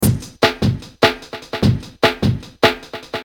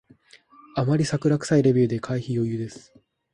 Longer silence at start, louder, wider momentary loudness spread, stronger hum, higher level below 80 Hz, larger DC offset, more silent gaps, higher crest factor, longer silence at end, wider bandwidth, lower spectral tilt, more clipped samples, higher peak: second, 0 s vs 0.75 s; first, -18 LUFS vs -23 LUFS; about the same, 12 LU vs 12 LU; neither; first, -36 dBFS vs -58 dBFS; neither; neither; about the same, 18 dB vs 16 dB; second, 0 s vs 0.55 s; first, 19 kHz vs 11.5 kHz; second, -5 dB/octave vs -7 dB/octave; neither; first, 0 dBFS vs -8 dBFS